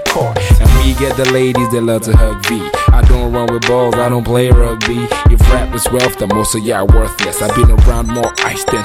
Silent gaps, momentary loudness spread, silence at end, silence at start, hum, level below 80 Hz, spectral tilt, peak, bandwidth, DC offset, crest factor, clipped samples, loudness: none; 5 LU; 0 s; 0 s; none; -12 dBFS; -5.5 dB/octave; 0 dBFS; 16 kHz; under 0.1%; 10 dB; 0.7%; -12 LUFS